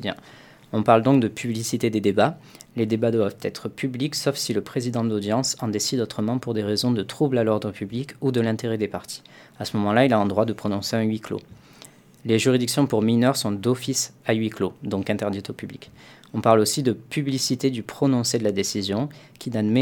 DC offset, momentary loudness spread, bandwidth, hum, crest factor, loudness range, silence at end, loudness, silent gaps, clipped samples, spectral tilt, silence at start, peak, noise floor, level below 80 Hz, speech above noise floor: under 0.1%; 12 LU; 19 kHz; none; 22 dB; 2 LU; 0 s; -23 LUFS; none; under 0.1%; -5 dB/octave; 0 s; -2 dBFS; -49 dBFS; -64 dBFS; 26 dB